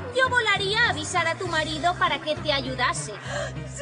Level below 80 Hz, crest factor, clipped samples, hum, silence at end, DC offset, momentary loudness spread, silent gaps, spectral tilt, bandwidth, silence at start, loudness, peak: -46 dBFS; 16 dB; under 0.1%; none; 0 s; under 0.1%; 10 LU; none; -3 dB/octave; 10 kHz; 0 s; -24 LUFS; -8 dBFS